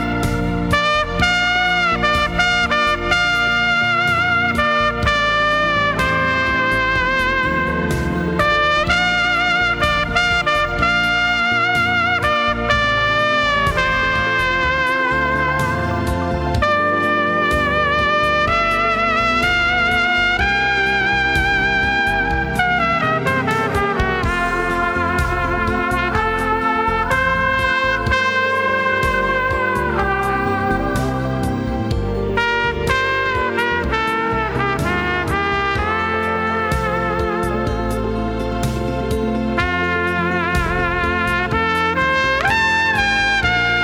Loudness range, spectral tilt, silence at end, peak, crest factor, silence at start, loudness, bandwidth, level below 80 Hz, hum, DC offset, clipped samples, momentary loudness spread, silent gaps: 4 LU; -5 dB/octave; 0 s; 0 dBFS; 18 dB; 0 s; -17 LUFS; over 20 kHz; -30 dBFS; none; under 0.1%; under 0.1%; 5 LU; none